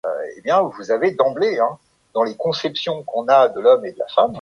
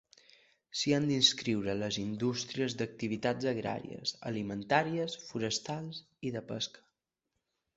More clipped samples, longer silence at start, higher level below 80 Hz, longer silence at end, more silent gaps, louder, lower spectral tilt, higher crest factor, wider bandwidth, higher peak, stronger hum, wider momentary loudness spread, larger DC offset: neither; second, 0.05 s vs 0.75 s; about the same, -64 dBFS vs -68 dBFS; second, 0 s vs 1 s; neither; first, -19 LUFS vs -33 LUFS; about the same, -5 dB/octave vs -4 dB/octave; second, 16 dB vs 24 dB; first, 9.8 kHz vs 8.2 kHz; first, -2 dBFS vs -10 dBFS; neither; second, 9 LU vs 13 LU; neither